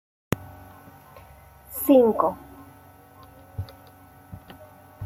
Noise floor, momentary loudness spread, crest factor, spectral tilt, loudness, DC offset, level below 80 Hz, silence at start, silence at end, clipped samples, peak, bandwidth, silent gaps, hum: -50 dBFS; 29 LU; 22 dB; -6.5 dB/octave; -22 LUFS; under 0.1%; -54 dBFS; 0.3 s; 0 s; under 0.1%; -6 dBFS; 16.5 kHz; none; none